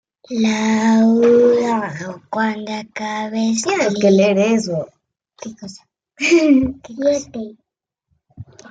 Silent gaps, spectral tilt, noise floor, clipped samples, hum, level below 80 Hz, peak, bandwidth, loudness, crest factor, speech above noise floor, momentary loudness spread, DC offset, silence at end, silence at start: none; -5 dB/octave; -75 dBFS; under 0.1%; none; -54 dBFS; -2 dBFS; 9.2 kHz; -16 LUFS; 14 dB; 58 dB; 20 LU; under 0.1%; 0.25 s; 0.3 s